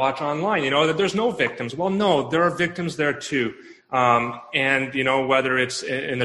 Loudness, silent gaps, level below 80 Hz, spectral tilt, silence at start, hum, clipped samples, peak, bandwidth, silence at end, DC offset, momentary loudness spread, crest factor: -22 LUFS; none; -60 dBFS; -4.5 dB/octave; 0 s; none; under 0.1%; -4 dBFS; 12 kHz; 0 s; under 0.1%; 6 LU; 18 dB